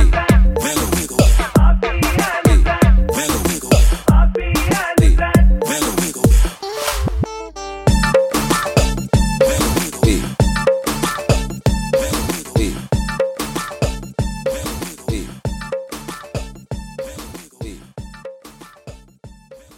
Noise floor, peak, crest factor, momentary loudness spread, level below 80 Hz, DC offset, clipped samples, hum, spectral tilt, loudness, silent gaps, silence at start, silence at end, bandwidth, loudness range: -42 dBFS; 0 dBFS; 16 dB; 16 LU; -18 dBFS; under 0.1%; under 0.1%; none; -5 dB/octave; -17 LUFS; none; 0 s; 0.2 s; 16.5 kHz; 13 LU